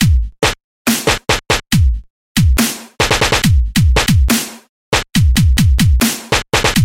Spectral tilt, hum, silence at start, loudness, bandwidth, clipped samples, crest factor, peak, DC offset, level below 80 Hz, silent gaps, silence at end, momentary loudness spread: -4 dB/octave; none; 0 s; -14 LUFS; 17 kHz; under 0.1%; 12 dB; 0 dBFS; under 0.1%; -18 dBFS; 0.64-0.85 s, 2.10-2.35 s, 4.69-4.92 s; 0 s; 6 LU